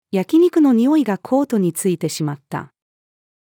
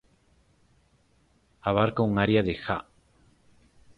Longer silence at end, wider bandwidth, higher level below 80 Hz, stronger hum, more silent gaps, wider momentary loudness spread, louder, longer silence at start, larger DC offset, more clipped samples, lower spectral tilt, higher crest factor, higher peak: second, 0.85 s vs 1.15 s; first, 18 kHz vs 5.4 kHz; second, -72 dBFS vs -52 dBFS; neither; neither; first, 13 LU vs 10 LU; first, -17 LUFS vs -26 LUFS; second, 0.15 s vs 1.65 s; neither; neither; second, -6 dB/octave vs -8.5 dB/octave; second, 12 dB vs 22 dB; about the same, -6 dBFS vs -8 dBFS